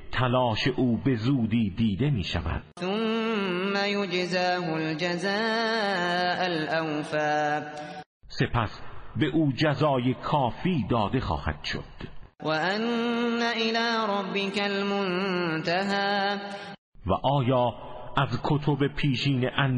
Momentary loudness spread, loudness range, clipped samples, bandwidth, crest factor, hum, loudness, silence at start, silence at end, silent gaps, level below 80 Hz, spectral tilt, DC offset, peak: 9 LU; 2 LU; under 0.1%; 10.5 kHz; 18 dB; none; -27 LUFS; 0 s; 0 s; 8.06-8.20 s, 16.78-16.92 s; -46 dBFS; -6.5 dB/octave; under 0.1%; -8 dBFS